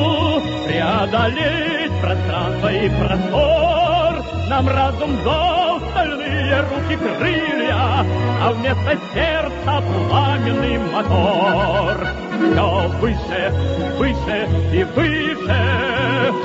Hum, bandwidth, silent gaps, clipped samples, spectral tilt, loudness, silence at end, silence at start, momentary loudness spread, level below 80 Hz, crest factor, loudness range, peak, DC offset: none; 7.8 kHz; none; under 0.1%; -7 dB/octave; -18 LUFS; 0 s; 0 s; 4 LU; -32 dBFS; 14 dB; 1 LU; -2 dBFS; under 0.1%